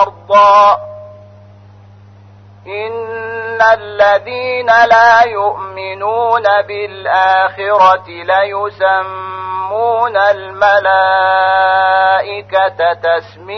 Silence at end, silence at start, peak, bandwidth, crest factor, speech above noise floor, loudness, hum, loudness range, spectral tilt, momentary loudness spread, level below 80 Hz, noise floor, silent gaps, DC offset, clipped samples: 0 s; 0 s; 0 dBFS; 6.4 kHz; 12 dB; 27 dB; -11 LUFS; none; 5 LU; -3.5 dB/octave; 14 LU; -54 dBFS; -39 dBFS; none; under 0.1%; under 0.1%